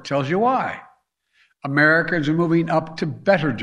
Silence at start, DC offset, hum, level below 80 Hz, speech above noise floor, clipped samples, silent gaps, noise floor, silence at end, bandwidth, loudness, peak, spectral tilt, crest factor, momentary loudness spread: 0.05 s; under 0.1%; none; -58 dBFS; 43 dB; under 0.1%; none; -63 dBFS; 0 s; 9.8 kHz; -20 LUFS; -4 dBFS; -7 dB/octave; 18 dB; 12 LU